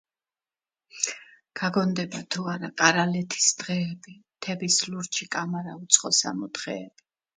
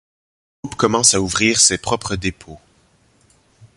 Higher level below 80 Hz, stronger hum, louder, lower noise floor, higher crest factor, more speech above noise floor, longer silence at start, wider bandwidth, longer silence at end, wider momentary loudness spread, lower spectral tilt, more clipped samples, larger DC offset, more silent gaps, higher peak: second, -72 dBFS vs -44 dBFS; neither; second, -25 LUFS vs -15 LUFS; first, under -90 dBFS vs -57 dBFS; first, 26 dB vs 20 dB; first, over 63 dB vs 39 dB; first, 0.95 s vs 0.65 s; second, 9.8 kHz vs 11.5 kHz; second, 0.5 s vs 1.2 s; about the same, 13 LU vs 14 LU; about the same, -2.5 dB/octave vs -2 dB/octave; neither; neither; neither; about the same, -2 dBFS vs 0 dBFS